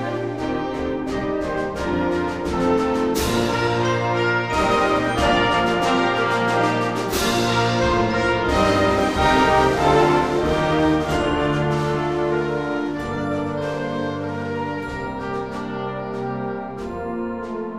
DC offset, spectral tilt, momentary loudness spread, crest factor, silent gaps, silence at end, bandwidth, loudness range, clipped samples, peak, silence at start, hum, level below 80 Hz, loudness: 0.3%; -5.5 dB/octave; 10 LU; 16 dB; none; 0 s; 15.5 kHz; 8 LU; under 0.1%; -4 dBFS; 0 s; none; -38 dBFS; -21 LUFS